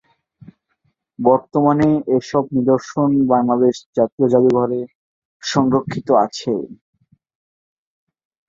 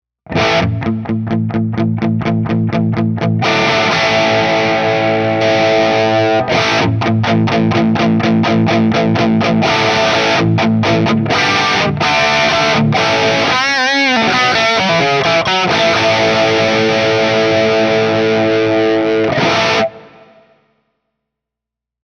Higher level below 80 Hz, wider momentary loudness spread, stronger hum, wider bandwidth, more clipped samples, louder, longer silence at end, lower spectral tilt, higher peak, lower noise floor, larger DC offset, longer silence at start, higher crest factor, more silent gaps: second, -56 dBFS vs -46 dBFS; first, 9 LU vs 5 LU; neither; second, 7.6 kHz vs 9.6 kHz; neither; second, -17 LUFS vs -12 LUFS; second, 1.75 s vs 1.95 s; first, -7 dB/octave vs -5 dB/octave; about the same, -2 dBFS vs 0 dBFS; second, -67 dBFS vs -83 dBFS; neither; first, 1.2 s vs 0.3 s; about the same, 16 dB vs 12 dB; first, 3.86-3.93 s, 4.12-4.18 s, 4.95-5.40 s vs none